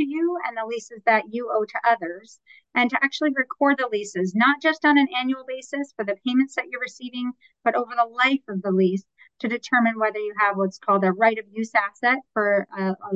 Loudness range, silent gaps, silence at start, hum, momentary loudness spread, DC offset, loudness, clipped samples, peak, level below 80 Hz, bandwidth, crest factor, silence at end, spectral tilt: 3 LU; none; 0 s; none; 11 LU; under 0.1%; -23 LUFS; under 0.1%; -6 dBFS; -78 dBFS; 8.2 kHz; 18 dB; 0 s; -5.5 dB/octave